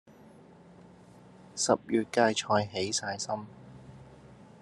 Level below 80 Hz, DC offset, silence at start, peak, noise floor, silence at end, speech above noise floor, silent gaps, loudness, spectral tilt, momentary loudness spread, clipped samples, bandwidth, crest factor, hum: -68 dBFS; under 0.1%; 1.15 s; -8 dBFS; -54 dBFS; 0.25 s; 25 dB; none; -29 LUFS; -3.5 dB/octave; 24 LU; under 0.1%; 12 kHz; 24 dB; none